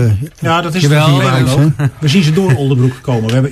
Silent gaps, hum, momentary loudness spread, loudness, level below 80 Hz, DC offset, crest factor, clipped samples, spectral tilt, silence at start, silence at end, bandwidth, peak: none; none; 5 LU; -12 LUFS; -40 dBFS; under 0.1%; 10 dB; under 0.1%; -6.5 dB/octave; 0 s; 0 s; 13.5 kHz; 0 dBFS